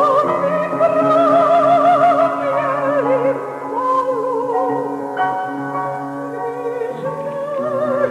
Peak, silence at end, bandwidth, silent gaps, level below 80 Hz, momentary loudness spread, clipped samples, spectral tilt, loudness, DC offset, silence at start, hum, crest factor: -4 dBFS; 0 s; 11.5 kHz; none; -64 dBFS; 11 LU; under 0.1%; -7 dB/octave; -17 LUFS; under 0.1%; 0 s; none; 14 dB